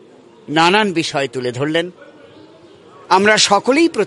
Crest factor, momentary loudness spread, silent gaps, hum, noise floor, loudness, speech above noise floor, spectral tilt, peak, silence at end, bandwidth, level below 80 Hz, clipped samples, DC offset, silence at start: 16 dB; 10 LU; none; none; -43 dBFS; -15 LUFS; 29 dB; -3.5 dB/octave; 0 dBFS; 0 s; 11.5 kHz; -62 dBFS; under 0.1%; under 0.1%; 0.5 s